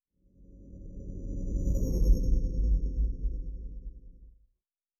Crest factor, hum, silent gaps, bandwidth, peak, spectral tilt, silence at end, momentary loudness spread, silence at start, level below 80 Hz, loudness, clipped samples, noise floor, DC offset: 18 dB; none; none; 12.5 kHz; -12 dBFS; -9 dB/octave; 0.7 s; 20 LU; 0.5 s; -30 dBFS; -33 LUFS; under 0.1%; -81 dBFS; under 0.1%